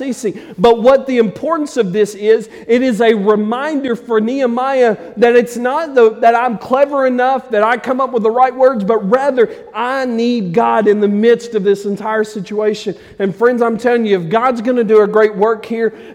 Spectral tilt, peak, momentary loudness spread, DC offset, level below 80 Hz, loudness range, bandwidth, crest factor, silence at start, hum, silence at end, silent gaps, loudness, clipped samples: -6 dB/octave; 0 dBFS; 7 LU; under 0.1%; -54 dBFS; 2 LU; 12.5 kHz; 12 dB; 0 s; none; 0 s; none; -14 LUFS; under 0.1%